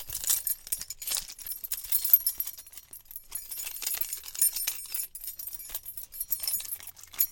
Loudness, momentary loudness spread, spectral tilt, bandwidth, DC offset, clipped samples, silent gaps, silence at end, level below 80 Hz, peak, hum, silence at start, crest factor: -29 LUFS; 15 LU; 2 dB/octave; 17.5 kHz; under 0.1%; under 0.1%; none; 0 s; -60 dBFS; -6 dBFS; none; 0 s; 28 dB